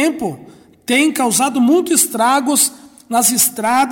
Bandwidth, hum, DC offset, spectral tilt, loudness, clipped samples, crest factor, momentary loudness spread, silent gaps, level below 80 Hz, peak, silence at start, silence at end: 17 kHz; none; under 0.1%; -2 dB/octave; -14 LUFS; under 0.1%; 14 dB; 7 LU; none; -60 dBFS; -2 dBFS; 0 s; 0 s